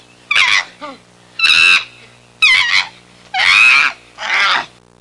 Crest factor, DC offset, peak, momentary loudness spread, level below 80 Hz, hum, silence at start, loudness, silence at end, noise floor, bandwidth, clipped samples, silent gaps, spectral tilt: 14 dB; under 0.1%; -2 dBFS; 19 LU; -56 dBFS; 60 Hz at -50 dBFS; 0.3 s; -10 LUFS; 0.35 s; -43 dBFS; 11.5 kHz; under 0.1%; none; 1 dB/octave